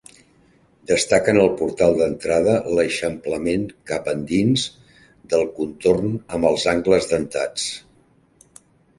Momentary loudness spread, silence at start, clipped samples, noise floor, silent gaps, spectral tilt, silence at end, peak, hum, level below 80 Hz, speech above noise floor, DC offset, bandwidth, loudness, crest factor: 8 LU; 0.9 s; under 0.1%; -57 dBFS; none; -4.5 dB/octave; 1.2 s; -2 dBFS; none; -48 dBFS; 37 dB; under 0.1%; 11.5 kHz; -20 LUFS; 20 dB